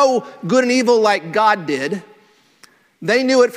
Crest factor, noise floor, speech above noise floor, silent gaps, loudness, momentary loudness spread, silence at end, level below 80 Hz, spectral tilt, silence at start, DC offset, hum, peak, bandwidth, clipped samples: 16 dB; -53 dBFS; 37 dB; none; -16 LUFS; 10 LU; 0 s; -66 dBFS; -4 dB/octave; 0 s; under 0.1%; none; 0 dBFS; 13 kHz; under 0.1%